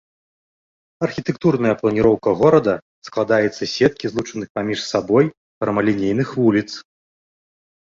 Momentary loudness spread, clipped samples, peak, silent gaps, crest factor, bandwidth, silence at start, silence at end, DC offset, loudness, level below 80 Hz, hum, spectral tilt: 10 LU; under 0.1%; -2 dBFS; 2.82-3.02 s, 4.50-4.55 s, 5.37-5.61 s; 18 dB; 7.6 kHz; 1 s; 1.1 s; under 0.1%; -19 LUFS; -52 dBFS; none; -6.5 dB/octave